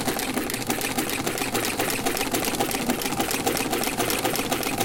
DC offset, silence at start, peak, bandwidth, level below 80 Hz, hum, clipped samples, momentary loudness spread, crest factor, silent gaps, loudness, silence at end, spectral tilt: under 0.1%; 0 s; -8 dBFS; 17.5 kHz; -46 dBFS; none; under 0.1%; 2 LU; 18 dB; none; -25 LUFS; 0 s; -2.5 dB/octave